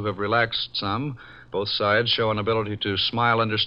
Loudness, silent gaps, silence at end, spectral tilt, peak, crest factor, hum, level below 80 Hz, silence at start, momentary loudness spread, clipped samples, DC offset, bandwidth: -23 LUFS; none; 0 s; -7 dB/octave; -8 dBFS; 16 dB; none; -54 dBFS; 0 s; 9 LU; under 0.1%; 0.1%; 5.8 kHz